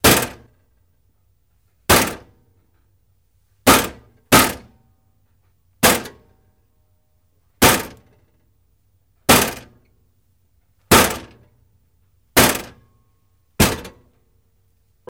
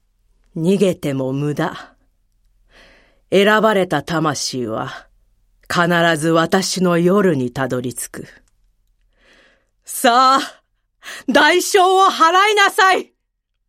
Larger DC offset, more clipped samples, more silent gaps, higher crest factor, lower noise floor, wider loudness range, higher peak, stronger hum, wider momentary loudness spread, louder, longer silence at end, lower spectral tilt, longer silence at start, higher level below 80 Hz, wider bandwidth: neither; neither; neither; first, 22 dB vs 16 dB; second, -63 dBFS vs -72 dBFS; about the same, 4 LU vs 6 LU; about the same, 0 dBFS vs -2 dBFS; neither; about the same, 18 LU vs 16 LU; about the same, -16 LUFS vs -15 LUFS; first, 1.2 s vs 0.65 s; about the same, -3 dB/octave vs -4 dB/octave; second, 0.05 s vs 0.55 s; first, -40 dBFS vs -56 dBFS; about the same, 17.5 kHz vs 16.5 kHz